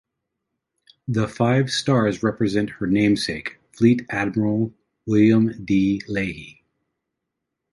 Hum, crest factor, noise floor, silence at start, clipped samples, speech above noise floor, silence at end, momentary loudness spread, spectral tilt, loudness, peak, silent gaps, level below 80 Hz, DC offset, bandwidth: none; 18 dB; -81 dBFS; 1.1 s; under 0.1%; 61 dB; 1.2 s; 11 LU; -6.5 dB/octave; -21 LUFS; -4 dBFS; none; -52 dBFS; under 0.1%; 11.5 kHz